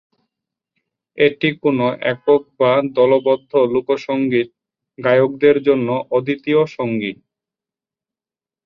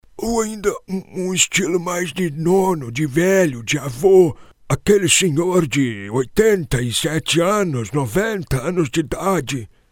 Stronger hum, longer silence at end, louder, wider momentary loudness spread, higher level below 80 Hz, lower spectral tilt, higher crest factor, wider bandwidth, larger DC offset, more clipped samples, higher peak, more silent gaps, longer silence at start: neither; first, 1.5 s vs 0.25 s; about the same, -17 LUFS vs -18 LUFS; second, 6 LU vs 9 LU; second, -62 dBFS vs -42 dBFS; first, -8 dB/octave vs -4.5 dB/octave; about the same, 16 dB vs 18 dB; second, 6.4 kHz vs 17.5 kHz; neither; neither; about the same, -2 dBFS vs 0 dBFS; neither; first, 1.15 s vs 0.15 s